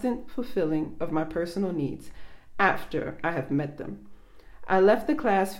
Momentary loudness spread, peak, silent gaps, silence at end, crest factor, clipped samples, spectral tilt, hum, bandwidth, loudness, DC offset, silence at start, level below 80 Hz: 15 LU; -6 dBFS; none; 0 s; 20 dB; under 0.1%; -7 dB/octave; none; 16 kHz; -27 LUFS; under 0.1%; 0 s; -52 dBFS